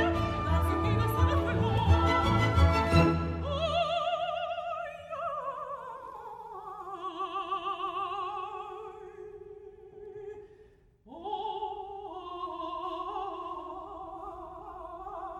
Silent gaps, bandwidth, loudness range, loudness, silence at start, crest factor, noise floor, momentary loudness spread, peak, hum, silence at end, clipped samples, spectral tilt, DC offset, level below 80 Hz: none; 12.5 kHz; 15 LU; -31 LUFS; 0 s; 20 dB; -59 dBFS; 20 LU; -10 dBFS; none; 0 s; under 0.1%; -7 dB/octave; under 0.1%; -40 dBFS